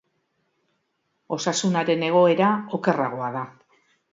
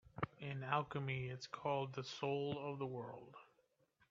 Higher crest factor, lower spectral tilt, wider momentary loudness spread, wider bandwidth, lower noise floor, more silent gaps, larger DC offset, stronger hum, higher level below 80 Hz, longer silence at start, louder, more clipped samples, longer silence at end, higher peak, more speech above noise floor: second, 18 dB vs 24 dB; about the same, -5 dB/octave vs -4.5 dB/octave; about the same, 13 LU vs 11 LU; about the same, 7.8 kHz vs 7.4 kHz; second, -73 dBFS vs -78 dBFS; neither; neither; neither; about the same, -72 dBFS vs -74 dBFS; first, 1.3 s vs 0.05 s; first, -22 LUFS vs -44 LUFS; neither; about the same, 0.6 s vs 0.65 s; first, -6 dBFS vs -20 dBFS; first, 52 dB vs 35 dB